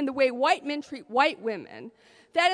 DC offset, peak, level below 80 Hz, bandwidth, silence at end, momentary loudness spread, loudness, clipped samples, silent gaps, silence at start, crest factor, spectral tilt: under 0.1%; -8 dBFS; -72 dBFS; 10.5 kHz; 0 s; 20 LU; -26 LUFS; under 0.1%; none; 0 s; 18 dB; -3 dB/octave